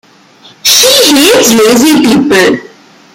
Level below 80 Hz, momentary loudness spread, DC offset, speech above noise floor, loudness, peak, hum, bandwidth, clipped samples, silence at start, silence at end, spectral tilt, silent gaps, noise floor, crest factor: -44 dBFS; 6 LU; under 0.1%; 33 dB; -5 LUFS; 0 dBFS; none; over 20 kHz; 0.8%; 0.65 s; 0.5 s; -2 dB/octave; none; -38 dBFS; 8 dB